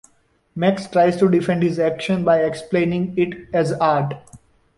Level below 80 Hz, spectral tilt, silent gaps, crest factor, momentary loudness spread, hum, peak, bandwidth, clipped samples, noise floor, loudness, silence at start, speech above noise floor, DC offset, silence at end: -54 dBFS; -7 dB/octave; none; 16 dB; 5 LU; none; -4 dBFS; 11.5 kHz; under 0.1%; -61 dBFS; -19 LUFS; 0.55 s; 42 dB; under 0.1%; 0.4 s